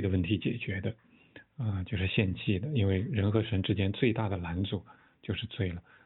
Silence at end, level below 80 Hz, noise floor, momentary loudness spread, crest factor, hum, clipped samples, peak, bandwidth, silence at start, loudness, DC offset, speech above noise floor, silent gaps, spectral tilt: 0.25 s; -54 dBFS; -57 dBFS; 9 LU; 20 dB; none; under 0.1%; -12 dBFS; 4.1 kHz; 0 s; -32 LUFS; under 0.1%; 26 dB; none; -11 dB/octave